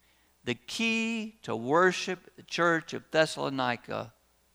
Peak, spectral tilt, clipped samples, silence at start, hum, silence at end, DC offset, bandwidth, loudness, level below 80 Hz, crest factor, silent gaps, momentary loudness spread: -10 dBFS; -4 dB/octave; under 0.1%; 0.45 s; none; 0.45 s; under 0.1%; over 20 kHz; -29 LUFS; -70 dBFS; 20 dB; none; 14 LU